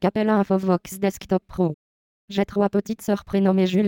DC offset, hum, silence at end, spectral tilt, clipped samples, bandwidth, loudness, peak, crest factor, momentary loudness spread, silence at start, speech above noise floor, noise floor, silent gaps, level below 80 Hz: under 0.1%; none; 0 s; -7 dB/octave; under 0.1%; 17 kHz; -23 LUFS; -6 dBFS; 16 dB; 7 LU; 0 s; over 69 dB; under -90 dBFS; 1.74-2.28 s; -52 dBFS